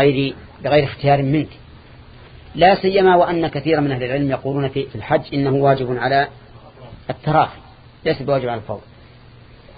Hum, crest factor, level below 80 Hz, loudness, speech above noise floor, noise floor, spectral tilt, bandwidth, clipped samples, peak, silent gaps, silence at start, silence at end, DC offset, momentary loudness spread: none; 18 dB; -46 dBFS; -18 LUFS; 26 dB; -44 dBFS; -11.5 dB/octave; 5 kHz; under 0.1%; 0 dBFS; none; 0 s; 1 s; under 0.1%; 13 LU